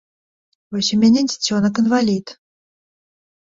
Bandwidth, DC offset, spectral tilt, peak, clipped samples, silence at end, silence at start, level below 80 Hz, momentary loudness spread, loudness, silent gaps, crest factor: 7.8 kHz; under 0.1%; -4.5 dB/octave; -4 dBFS; under 0.1%; 1.2 s; 0.7 s; -58 dBFS; 8 LU; -17 LUFS; none; 16 dB